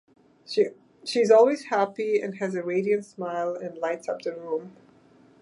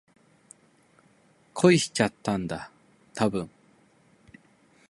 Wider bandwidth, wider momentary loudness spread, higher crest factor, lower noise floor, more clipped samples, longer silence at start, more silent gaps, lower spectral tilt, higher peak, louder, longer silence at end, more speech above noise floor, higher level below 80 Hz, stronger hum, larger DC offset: about the same, 11 kHz vs 11.5 kHz; second, 14 LU vs 22 LU; about the same, 20 dB vs 24 dB; second, -56 dBFS vs -62 dBFS; neither; second, 0.5 s vs 1.55 s; neither; about the same, -5 dB/octave vs -5 dB/octave; about the same, -6 dBFS vs -6 dBFS; about the same, -26 LUFS vs -26 LUFS; second, 0.7 s vs 1.4 s; second, 32 dB vs 37 dB; second, -80 dBFS vs -60 dBFS; neither; neither